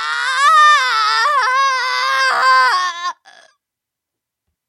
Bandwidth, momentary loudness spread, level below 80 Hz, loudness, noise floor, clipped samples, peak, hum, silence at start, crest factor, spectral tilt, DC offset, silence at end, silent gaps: 15 kHz; 8 LU; -88 dBFS; -13 LUFS; -82 dBFS; under 0.1%; -2 dBFS; none; 0 s; 14 dB; 3.5 dB/octave; under 0.1%; 1.55 s; none